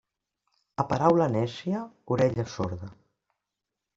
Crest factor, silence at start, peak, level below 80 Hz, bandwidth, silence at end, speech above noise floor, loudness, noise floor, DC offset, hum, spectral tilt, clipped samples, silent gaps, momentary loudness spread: 22 dB; 0.8 s; -6 dBFS; -60 dBFS; 7.8 kHz; 1.05 s; 60 dB; -27 LUFS; -86 dBFS; under 0.1%; none; -7.5 dB/octave; under 0.1%; none; 15 LU